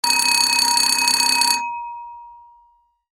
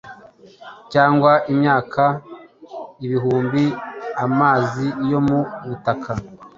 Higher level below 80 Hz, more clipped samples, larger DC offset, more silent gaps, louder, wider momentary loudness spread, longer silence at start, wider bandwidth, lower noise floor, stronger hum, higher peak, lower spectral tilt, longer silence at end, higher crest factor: second, -64 dBFS vs -52 dBFS; neither; neither; neither; first, -15 LUFS vs -19 LUFS; about the same, 16 LU vs 14 LU; about the same, 0.05 s vs 0.05 s; first, 17 kHz vs 7.4 kHz; first, -58 dBFS vs -45 dBFS; neither; about the same, 0 dBFS vs -2 dBFS; second, 2.5 dB/octave vs -8 dB/octave; first, 0.8 s vs 0.1 s; about the same, 20 dB vs 18 dB